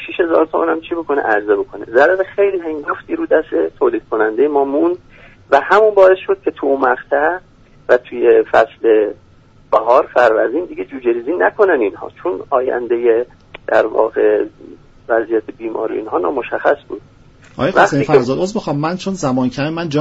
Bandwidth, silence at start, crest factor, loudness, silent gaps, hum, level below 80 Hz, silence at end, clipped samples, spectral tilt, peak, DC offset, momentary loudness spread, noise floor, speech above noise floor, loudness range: 8 kHz; 0 s; 16 dB; -15 LUFS; none; none; -50 dBFS; 0 s; under 0.1%; -6 dB/octave; 0 dBFS; under 0.1%; 10 LU; -46 dBFS; 31 dB; 4 LU